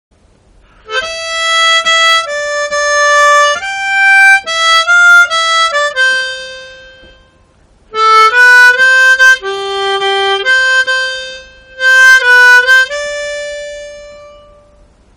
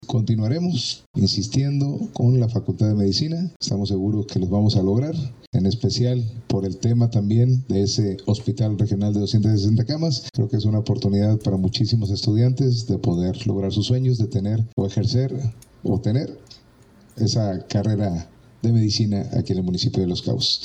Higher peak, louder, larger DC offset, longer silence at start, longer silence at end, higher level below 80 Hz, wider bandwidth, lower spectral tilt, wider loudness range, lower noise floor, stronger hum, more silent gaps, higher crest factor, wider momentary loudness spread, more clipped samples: first, 0 dBFS vs -8 dBFS; first, -7 LUFS vs -22 LUFS; neither; first, 0.9 s vs 0 s; first, 0.9 s vs 0 s; about the same, -48 dBFS vs -50 dBFS; first, over 20 kHz vs 8.4 kHz; second, 1 dB/octave vs -7 dB/octave; about the same, 3 LU vs 3 LU; second, -47 dBFS vs -51 dBFS; neither; second, none vs 1.06-1.14 s, 3.56-3.60 s, 5.47-5.53 s, 14.73-14.77 s; about the same, 10 dB vs 14 dB; first, 15 LU vs 6 LU; first, 2% vs under 0.1%